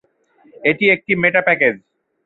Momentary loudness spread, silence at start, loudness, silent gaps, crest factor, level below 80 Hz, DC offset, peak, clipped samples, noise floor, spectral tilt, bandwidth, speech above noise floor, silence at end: 6 LU; 0.6 s; -15 LUFS; none; 18 dB; -58 dBFS; under 0.1%; -2 dBFS; under 0.1%; -54 dBFS; -8 dB/octave; 4.2 kHz; 38 dB; 0.5 s